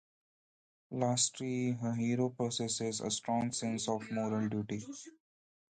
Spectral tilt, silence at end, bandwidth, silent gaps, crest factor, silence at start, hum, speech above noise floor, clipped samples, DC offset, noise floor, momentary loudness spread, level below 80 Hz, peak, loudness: -4.5 dB/octave; 0.7 s; 9.4 kHz; none; 18 dB; 0.9 s; none; over 55 dB; under 0.1%; under 0.1%; under -90 dBFS; 10 LU; -72 dBFS; -18 dBFS; -35 LUFS